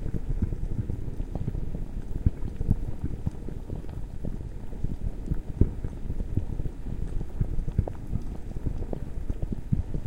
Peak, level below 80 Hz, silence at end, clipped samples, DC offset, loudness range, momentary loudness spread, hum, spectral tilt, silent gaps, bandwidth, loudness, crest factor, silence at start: -4 dBFS; -32 dBFS; 0 s; under 0.1%; under 0.1%; 2 LU; 8 LU; none; -9.5 dB/octave; none; 7.8 kHz; -34 LUFS; 26 dB; 0 s